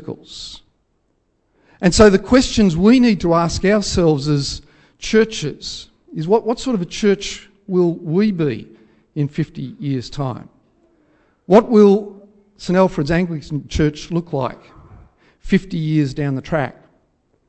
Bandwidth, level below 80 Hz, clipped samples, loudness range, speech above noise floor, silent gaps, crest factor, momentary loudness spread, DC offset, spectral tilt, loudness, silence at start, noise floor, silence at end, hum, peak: 8.6 kHz; -38 dBFS; under 0.1%; 7 LU; 48 dB; none; 18 dB; 18 LU; under 0.1%; -6 dB/octave; -17 LUFS; 0 s; -65 dBFS; 0.75 s; none; 0 dBFS